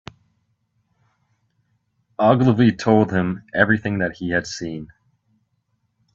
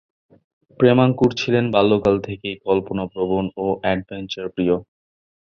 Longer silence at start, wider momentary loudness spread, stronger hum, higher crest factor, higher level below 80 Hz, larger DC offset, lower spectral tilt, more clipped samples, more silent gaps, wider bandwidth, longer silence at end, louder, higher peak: first, 2.2 s vs 0.8 s; about the same, 14 LU vs 12 LU; neither; about the same, 22 dB vs 18 dB; second, -56 dBFS vs -48 dBFS; neither; about the same, -7 dB/octave vs -7 dB/octave; neither; neither; first, 7.8 kHz vs 7 kHz; first, 1.3 s vs 0.75 s; about the same, -19 LUFS vs -20 LUFS; about the same, 0 dBFS vs -2 dBFS